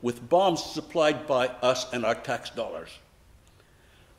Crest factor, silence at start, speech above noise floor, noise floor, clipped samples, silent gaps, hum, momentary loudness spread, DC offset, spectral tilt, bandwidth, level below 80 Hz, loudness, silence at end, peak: 18 dB; 0 s; 31 dB; -57 dBFS; under 0.1%; none; none; 12 LU; under 0.1%; -4 dB/octave; 15.5 kHz; -60 dBFS; -27 LUFS; 1.2 s; -10 dBFS